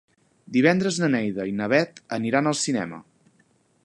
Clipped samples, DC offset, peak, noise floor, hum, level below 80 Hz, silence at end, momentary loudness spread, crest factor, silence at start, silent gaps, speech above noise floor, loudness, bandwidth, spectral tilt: under 0.1%; under 0.1%; -4 dBFS; -63 dBFS; none; -66 dBFS; 0.85 s; 9 LU; 20 dB; 0.5 s; none; 40 dB; -23 LUFS; 11.5 kHz; -5 dB/octave